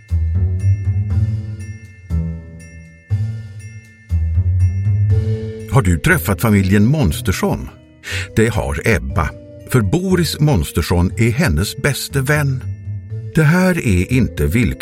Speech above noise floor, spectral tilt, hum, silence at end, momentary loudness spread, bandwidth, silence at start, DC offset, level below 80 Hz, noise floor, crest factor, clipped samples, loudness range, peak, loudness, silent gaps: 23 dB; -6 dB/octave; none; 0 s; 14 LU; 16.5 kHz; 0.1 s; under 0.1%; -28 dBFS; -38 dBFS; 16 dB; under 0.1%; 6 LU; 0 dBFS; -17 LUFS; none